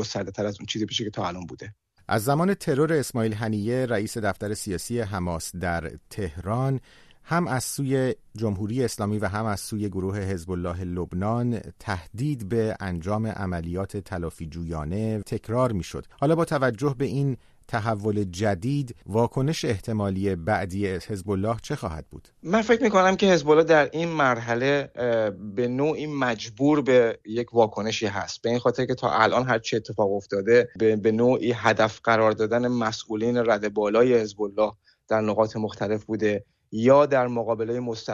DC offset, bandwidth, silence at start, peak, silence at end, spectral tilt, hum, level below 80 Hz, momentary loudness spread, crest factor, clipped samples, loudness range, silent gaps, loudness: under 0.1%; 13.5 kHz; 0 s; -4 dBFS; 0 s; -6 dB/octave; none; -50 dBFS; 11 LU; 20 dB; under 0.1%; 7 LU; none; -25 LUFS